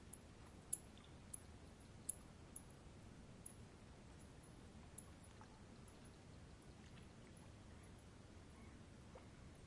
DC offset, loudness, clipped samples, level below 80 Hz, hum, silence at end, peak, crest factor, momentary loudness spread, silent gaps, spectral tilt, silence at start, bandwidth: under 0.1%; -57 LUFS; under 0.1%; -68 dBFS; none; 0 s; -26 dBFS; 32 dB; 12 LU; none; -4 dB/octave; 0 s; 12 kHz